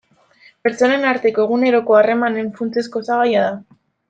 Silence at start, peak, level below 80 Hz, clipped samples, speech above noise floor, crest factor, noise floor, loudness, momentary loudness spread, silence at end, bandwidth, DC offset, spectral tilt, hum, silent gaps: 0.65 s; -2 dBFS; -66 dBFS; under 0.1%; 35 dB; 14 dB; -51 dBFS; -17 LUFS; 9 LU; 0.5 s; 8.8 kHz; under 0.1%; -5.5 dB/octave; none; none